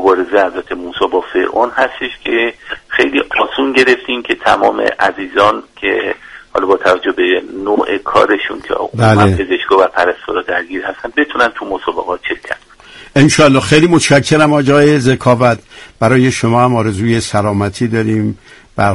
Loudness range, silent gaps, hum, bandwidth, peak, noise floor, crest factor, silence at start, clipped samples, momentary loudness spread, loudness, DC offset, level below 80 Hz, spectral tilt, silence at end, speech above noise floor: 5 LU; none; none; 11.5 kHz; 0 dBFS; -37 dBFS; 12 dB; 0 s; under 0.1%; 10 LU; -12 LUFS; under 0.1%; -42 dBFS; -5.5 dB/octave; 0 s; 25 dB